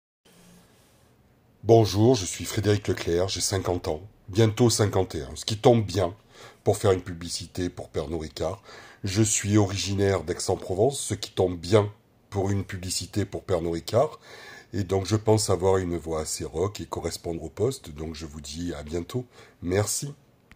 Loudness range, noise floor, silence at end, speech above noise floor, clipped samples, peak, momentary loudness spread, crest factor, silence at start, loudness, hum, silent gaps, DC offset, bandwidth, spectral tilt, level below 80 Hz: 6 LU; -60 dBFS; 0.4 s; 34 dB; under 0.1%; -4 dBFS; 14 LU; 22 dB; 1.65 s; -26 LUFS; none; none; under 0.1%; 16 kHz; -5 dB/octave; -52 dBFS